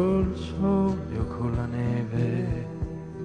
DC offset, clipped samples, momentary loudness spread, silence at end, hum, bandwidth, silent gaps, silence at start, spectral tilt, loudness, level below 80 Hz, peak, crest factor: under 0.1%; under 0.1%; 8 LU; 0 s; none; 9.4 kHz; none; 0 s; -9 dB/octave; -28 LUFS; -40 dBFS; -12 dBFS; 14 dB